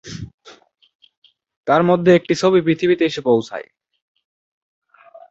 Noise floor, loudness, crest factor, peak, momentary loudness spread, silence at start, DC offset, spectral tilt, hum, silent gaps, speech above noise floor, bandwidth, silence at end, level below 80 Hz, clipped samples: -47 dBFS; -16 LUFS; 18 dB; -2 dBFS; 19 LU; 0.05 s; under 0.1%; -6.5 dB/octave; none; 0.34-0.38 s, 0.95-0.99 s, 1.17-1.22 s, 1.57-1.64 s; 32 dB; 8 kHz; 1.7 s; -56 dBFS; under 0.1%